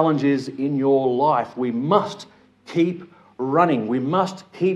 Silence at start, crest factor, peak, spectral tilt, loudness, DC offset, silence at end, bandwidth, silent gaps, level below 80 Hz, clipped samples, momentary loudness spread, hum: 0 s; 18 dB; -2 dBFS; -7.5 dB/octave; -21 LUFS; under 0.1%; 0 s; 9.8 kHz; none; -72 dBFS; under 0.1%; 9 LU; none